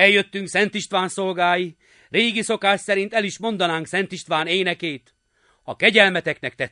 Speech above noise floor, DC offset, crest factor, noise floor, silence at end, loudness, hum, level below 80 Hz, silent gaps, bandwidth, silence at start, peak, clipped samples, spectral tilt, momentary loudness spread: 42 dB; under 0.1%; 22 dB; -63 dBFS; 0.05 s; -20 LUFS; none; -66 dBFS; none; 11 kHz; 0 s; 0 dBFS; under 0.1%; -3.5 dB/octave; 11 LU